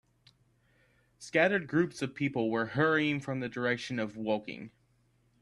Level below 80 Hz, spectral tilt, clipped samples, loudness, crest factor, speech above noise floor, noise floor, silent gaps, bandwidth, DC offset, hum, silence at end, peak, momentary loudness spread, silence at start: -70 dBFS; -6 dB/octave; under 0.1%; -31 LUFS; 22 dB; 39 dB; -70 dBFS; none; 12 kHz; under 0.1%; none; 0.75 s; -12 dBFS; 12 LU; 1.2 s